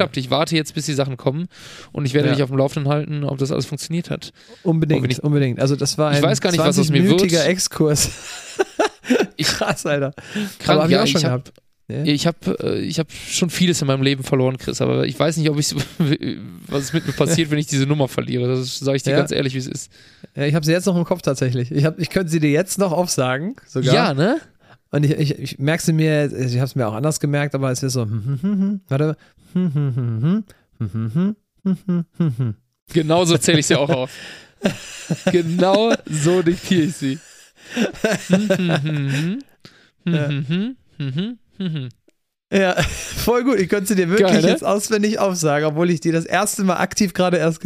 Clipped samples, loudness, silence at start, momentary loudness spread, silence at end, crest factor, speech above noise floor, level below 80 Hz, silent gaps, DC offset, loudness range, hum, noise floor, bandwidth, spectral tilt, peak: under 0.1%; -19 LUFS; 0 s; 10 LU; 0 s; 20 dB; 44 dB; -48 dBFS; 32.82-32.86 s; under 0.1%; 4 LU; none; -63 dBFS; 15.5 kHz; -5 dB/octave; 0 dBFS